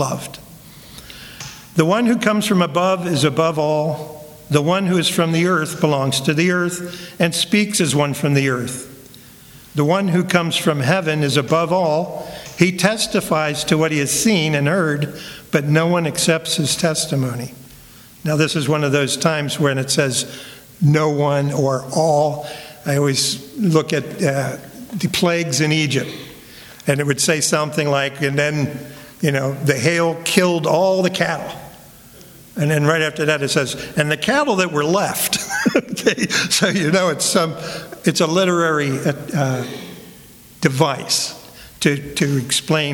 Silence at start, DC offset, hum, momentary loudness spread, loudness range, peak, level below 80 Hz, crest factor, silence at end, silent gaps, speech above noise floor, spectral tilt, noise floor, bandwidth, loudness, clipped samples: 0 s; under 0.1%; none; 13 LU; 2 LU; 0 dBFS; -54 dBFS; 18 dB; 0 s; none; 25 dB; -4.5 dB/octave; -43 dBFS; 19.5 kHz; -18 LUFS; under 0.1%